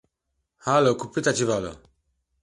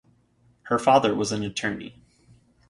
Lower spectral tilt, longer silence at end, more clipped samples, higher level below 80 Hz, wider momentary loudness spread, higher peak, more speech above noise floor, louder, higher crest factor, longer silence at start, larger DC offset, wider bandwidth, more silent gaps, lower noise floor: about the same, -4.5 dB/octave vs -4.5 dB/octave; second, 0.65 s vs 0.8 s; neither; about the same, -56 dBFS vs -60 dBFS; second, 12 LU vs 15 LU; about the same, -8 dBFS vs -6 dBFS; first, 56 dB vs 39 dB; about the same, -23 LUFS vs -23 LUFS; about the same, 18 dB vs 20 dB; about the same, 0.65 s vs 0.65 s; neither; about the same, 11.5 kHz vs 11.5 kHz; neither; first, -78 dBFS vs -62 dBFS